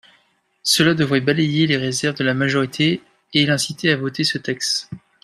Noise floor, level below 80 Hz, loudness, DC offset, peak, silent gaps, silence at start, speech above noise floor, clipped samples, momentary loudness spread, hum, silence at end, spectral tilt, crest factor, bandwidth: -61 dBFS; -58 dBFS; -19 LUFS; under 0.1%; -2 dBFS; none; 0.65 s; 42 dB; under 0.1%; 6 LU; none; 0.25 s; -4 dB/octave; 18 dB; 14.5 kHz